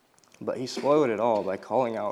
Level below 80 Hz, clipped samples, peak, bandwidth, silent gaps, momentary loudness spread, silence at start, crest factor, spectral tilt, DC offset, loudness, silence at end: -78 dBFS; under 0.1%; -12 dBFS; 12.5 kHz; none; 11 LU; 0.4 s; 16 dB; -5.5 dB/octave; under 0.1%; -26 LUFS; 0 s